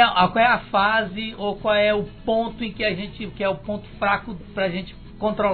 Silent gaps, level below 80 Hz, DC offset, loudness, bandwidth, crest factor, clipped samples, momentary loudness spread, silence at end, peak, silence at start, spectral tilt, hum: none; -44 dBFS; under 0.1%; -22 LUFS; 4.6 kHz; 20 dB; under 0.1%; 12 LU; 0 s; -2 dBFS; 0 s; -8 dB/octave; none